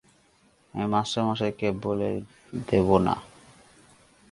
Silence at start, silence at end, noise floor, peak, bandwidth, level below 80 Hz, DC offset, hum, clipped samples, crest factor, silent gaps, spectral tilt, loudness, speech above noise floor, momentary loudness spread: 0.75 s; 1.05 s; -62 dBFS; -4 dBFS; 11.5 kHz; -50 dBFS; under 0.1%; none; under 0.1%; 24 dB; none; -6.5 dB/octave; -26 LUFS; 37 dB; 14 LU